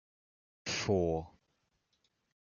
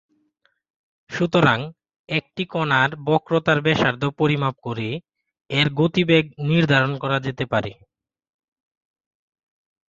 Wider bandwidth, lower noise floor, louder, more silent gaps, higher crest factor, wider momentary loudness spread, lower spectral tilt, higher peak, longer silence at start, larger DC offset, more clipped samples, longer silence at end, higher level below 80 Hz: about the same, 7.4 kHz vs 7.6 kHz; first, -80 dBFS vs -67 dBFS; second, -34 LUFS vs -21 LUFS; second, none vs 1.99-2.04 s; about the same, 20 dB vs 20 dB; first, 15 LU vs 10 LU; second, -4.5 dB/octave vs -6.5 dB/octave; second, -18 dBFS vs -2 dBFS; second, 0.65 s vs 1.1 s; neither; neither; second, 1.15 s vs 2.15 s; second, -62 dBFS vs -56 dBFS